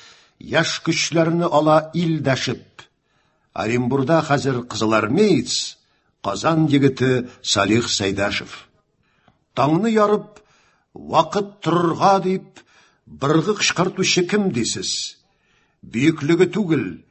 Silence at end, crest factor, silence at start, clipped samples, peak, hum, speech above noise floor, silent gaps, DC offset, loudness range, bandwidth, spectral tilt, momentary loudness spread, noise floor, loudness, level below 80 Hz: 0.1 s; 18 dB; 0.45 s; under 0.1%; -2 dBFS; none; 46 dB; none; under 0.1%; 2 LU; 8.6 kHz; -4.5 dB/octave; 10 LU; -64 dBFS; -19 LUFS; -54 dBFS